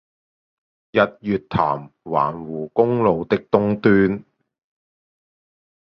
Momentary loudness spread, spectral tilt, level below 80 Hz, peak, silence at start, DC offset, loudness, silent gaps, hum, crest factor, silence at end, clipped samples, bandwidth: 9 LU; -9.5 dB/octave; -52 dBFS; -2 dBFS; 0.95 s; under 0.1%; -20 LUFS; none; none; 20 dB; 1.65 s; under 0.1%; 5.8 kHz